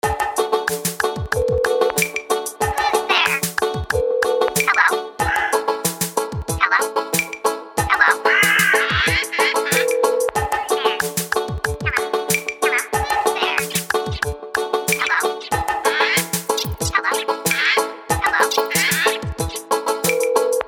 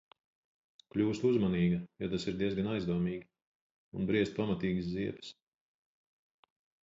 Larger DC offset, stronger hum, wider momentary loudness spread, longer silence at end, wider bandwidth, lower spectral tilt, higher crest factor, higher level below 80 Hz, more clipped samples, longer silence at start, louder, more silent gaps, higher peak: neither; neither; second, 7 LU vs 10 LU; second, 0 s vs 1.5 s; first, 18.5 kHz vs 7.8 kHz; second, -2.5 dB/octave vs -7.5 dB/octave; about the same, 18 dB vs 18 dB; first, -38 dBFS vs -60 dBFS; neither; second, 0.05 s vs 0.95 s; first, -18 LUFS vs -33 LUFS; second, none vs 3.46-3.92 s; first, -2 dBFS vs -18 dBFS